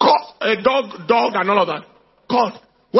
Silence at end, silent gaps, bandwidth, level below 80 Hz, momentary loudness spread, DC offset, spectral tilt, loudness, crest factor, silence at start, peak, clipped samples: 0 s; none; 6 kHz; -64 dBFS; 6 LU; under 0.1%; -6 dB/octave; -18 LUFS; 16 dB; 0 s; -2 dBFS; under 0.1%